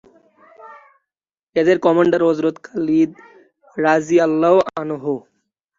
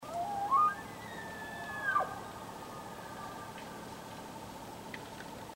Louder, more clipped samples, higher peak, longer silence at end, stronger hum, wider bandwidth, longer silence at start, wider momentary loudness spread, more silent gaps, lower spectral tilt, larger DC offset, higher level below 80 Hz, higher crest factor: first, -17 LUFS vs -38 LUFS; neither; first, -2 dBFS vs -20 dBFS; first, 0.6 s vs 0 s; neither; second, 7.6 kHz vs 16 kHz; first, 0.65 s vs 0 s; second, 10 LU vs 16 LU; first, 1.43-1.47 s vs none; first, -6.5 dB/octave vs -4 dB/octave; neither; about the same, -62 dBFS vs -64 dBFS; about the same, 16 dB vs 18 dB